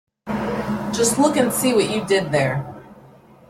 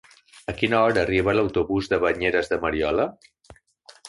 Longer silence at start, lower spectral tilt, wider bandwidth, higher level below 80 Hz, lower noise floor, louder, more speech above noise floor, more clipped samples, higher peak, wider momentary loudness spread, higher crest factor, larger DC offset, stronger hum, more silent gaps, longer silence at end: about the same, 0.25 s vs 0.35 s; second, -4.5 dB/octave vs -6 dB/octave; first, 16.5 kHz vs 11.5 kHz; about the same, -50 dBFS vs -46 dBFS; second, -47 dBFS vs -53 dBFS; about the same, -20 LUFS vs -22 LUFS; about the same, 29 dB vs 31 dB; neither; about the same, -4 dBFS vs -4 dBFS; first, 10 LU vs 7 LU; about the same, 18 dB vs 20 dB; neither; neither; neither; first, 0.5 s vs 0.2 s